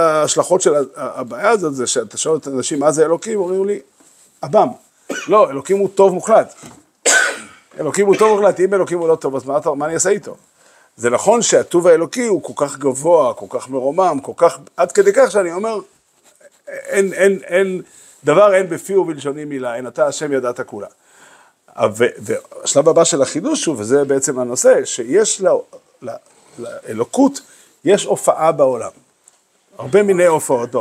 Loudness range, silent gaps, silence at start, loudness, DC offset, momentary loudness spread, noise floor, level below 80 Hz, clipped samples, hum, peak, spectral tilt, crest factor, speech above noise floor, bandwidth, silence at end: 3 LU; none; 0 s; -16 LUFS; under 0.1%; 14 LU; -54 dBFS; -66 dBFS; under 0.1%; none; 0 dBFS; -3.5 dB/octave; 16 dB; 39 dB; 15.5 kHz; 0 s